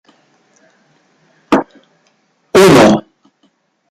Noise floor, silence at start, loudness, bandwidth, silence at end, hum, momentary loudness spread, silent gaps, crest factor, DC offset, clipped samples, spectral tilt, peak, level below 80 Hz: -59 dBFS; 1.5 s; -10 LUFS; 16 kHz; 0.9 s; none; 11 LU; none; 14 dB; under 0.1%; under 0.1%; -5 dB/octave; 0 dBFS; -48 dBFS